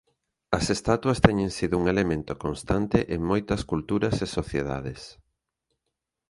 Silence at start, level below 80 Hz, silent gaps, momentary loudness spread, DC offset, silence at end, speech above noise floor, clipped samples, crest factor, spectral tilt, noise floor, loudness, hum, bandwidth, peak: 0.5 s; -42 dBFS; none; 11 LU; under 0.1%; 1.2 s; 58 dB; under 0.1%; 26 dB; -6 dB/octave; -83 dBFS; -26 LUFS; none; 11.5 kHz; 0 dBFS